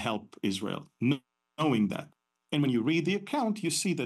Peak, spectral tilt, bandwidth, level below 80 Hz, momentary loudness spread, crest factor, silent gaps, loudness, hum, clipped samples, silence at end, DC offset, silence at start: -16 dBFS; -5 dB/octave; 12.5 kHz; -74 dBFS; 7 LU; 14 dB; none; -30 LUFS; none; under 0.1%; 0 s; under 0.1%; 0 s